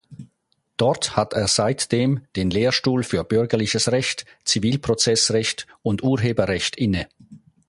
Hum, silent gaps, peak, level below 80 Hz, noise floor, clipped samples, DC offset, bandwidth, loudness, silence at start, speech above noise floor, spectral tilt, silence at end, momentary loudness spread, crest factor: none; none; -2 dBFS; -46 dBFS; -70 dBFS; under 0.1%; under 0.1%; 11.5 kHz; -21 LUFS; 0.1 s; 49 dB; -4 dB/octave; 0.3 s; 7 LU; 18 dB